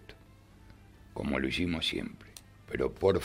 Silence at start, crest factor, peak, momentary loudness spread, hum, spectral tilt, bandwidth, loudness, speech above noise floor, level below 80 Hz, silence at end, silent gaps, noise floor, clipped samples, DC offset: 0 s; 22 dB; -12 dBFS; 22 LU; 50 Hz at -55 dBFS; -5.5 dB/octave; 16 kHz; -32 LUFS; 25 dB; -52 dBFS; 0 s; none; -56 dBFS; under 0.1%; under 0.1%